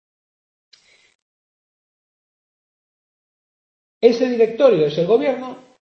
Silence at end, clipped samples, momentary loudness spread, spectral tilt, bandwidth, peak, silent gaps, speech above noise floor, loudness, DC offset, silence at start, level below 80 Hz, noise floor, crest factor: 0.35 s; under 0.1%; 10 LU; -6.5 dB/octave; 6.6 kHz; 0 dBFS; none; over 74 dB; -17 LUFS; under 0.1%; 4 s; -70 dBFS; under -90 dBFS; 20 dB